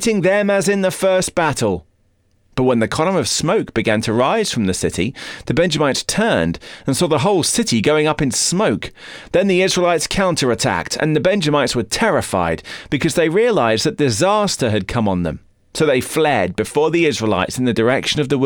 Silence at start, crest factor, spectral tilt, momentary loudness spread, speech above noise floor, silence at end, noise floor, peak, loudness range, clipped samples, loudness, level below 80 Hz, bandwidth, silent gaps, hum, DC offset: 0 s; 12 dB; -4.5 dB/octave; 7 LU; 42 dB; 0 s; -59 dBFS; -6 dBFS; 2 LU; under 0.1%; -17 LUFS; -42 dBFS; over 20 kHz; none; none; under 0.1%